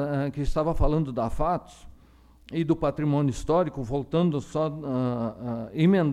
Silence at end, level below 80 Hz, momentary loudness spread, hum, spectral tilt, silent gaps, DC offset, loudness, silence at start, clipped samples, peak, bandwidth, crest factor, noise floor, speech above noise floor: 0 s; -36 dBFS; 7 LU; none; -8 dB/octave; none; under 0.1%; -27 LUFS; 0 s; under 0.1%; -10 dBFS; 11.5 kHz; 16 dB; -55 dBFS; 29 dB